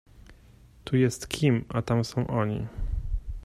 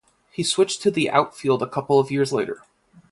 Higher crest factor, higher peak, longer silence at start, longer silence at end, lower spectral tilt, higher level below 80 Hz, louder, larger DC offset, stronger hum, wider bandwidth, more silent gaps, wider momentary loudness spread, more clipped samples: about the same, 18 dB vs 20 dB; second, -10 dBFS vs -2 dBFS; second, 0.2 s vs 0.4 s; second, 0 s vs 0.55 s; first, -6.5 dB/octave vs -4.5 dB/octave; first, -38 dBFS vs -64 dBFS; second, -28 LUFS vs -22 LUFS; neither; neither; first, 14 kHz vs 11.5 kHz; neither; about the same, 10 LU vs 9 LU; neither